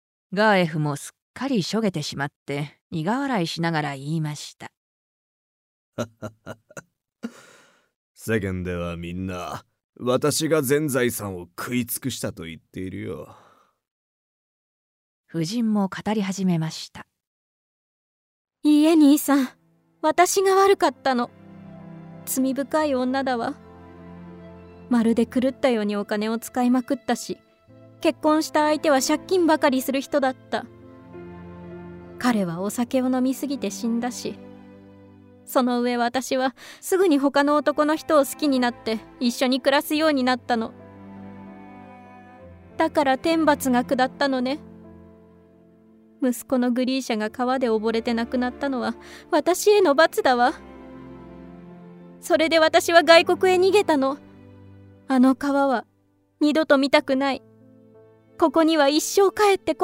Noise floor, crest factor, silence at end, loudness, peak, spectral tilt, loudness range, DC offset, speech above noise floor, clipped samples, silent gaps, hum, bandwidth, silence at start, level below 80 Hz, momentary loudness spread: -63 dBFS; 22 dB; 0 s; -22 LUFS; -2 dBFS; -4.5 dB/octave; 11 LU; under 0.1%; 42 dB; under 0.1%; 1.22-1.34 s, 2.36-2.46 s, 2.81-2.90 s, 4.77-5.92 s, 7.96-8.15 s, 9.84-9.93 s, 13.91-15.24 s, 17.27-18.45 s; none; 16 kHz; 0.3 s; -60 dBFS; 21 LU